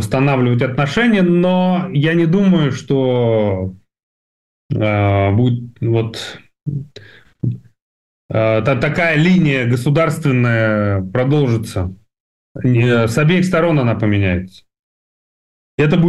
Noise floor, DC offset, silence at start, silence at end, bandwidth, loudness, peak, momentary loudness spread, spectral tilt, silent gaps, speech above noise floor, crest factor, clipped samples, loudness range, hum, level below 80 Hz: under -90 dBFS; 0.3%; 0 s; 0 s; 12.5 kHz; -15 LUFS; -6 dBFS; 12 LU; -7.5 dB/octave; 4.03-4.69 s, 7.82-8.29 s, 12.20-12.55 s, 14.79-15.78 s; over 76 dB; 10 dB; under 0.1%; 5 LU; none; -46 dBFS